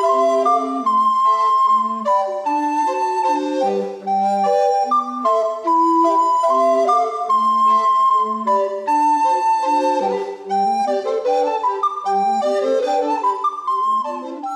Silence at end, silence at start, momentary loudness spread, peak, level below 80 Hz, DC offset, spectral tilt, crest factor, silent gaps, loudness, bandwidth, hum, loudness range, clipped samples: 0 s; 0 s; 6 LU; -6 dBFS; under -90 dBFS; under 0.1%; -4.5 dB/octave; 12 dB; none; -17 LUFS; 11.5 kHz; none; 3 LU; under 0.1%